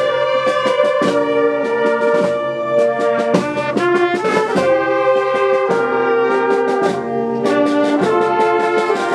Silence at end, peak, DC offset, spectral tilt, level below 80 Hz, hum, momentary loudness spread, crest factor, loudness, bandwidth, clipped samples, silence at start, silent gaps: 0 s; 0 dBFS; under 0.1%; -5.5 dB/octave; -62 dBFS; none; 3 LU; 16 dB; -15 LUFS; 11.5 kHz; under 0.1%; 0 s; none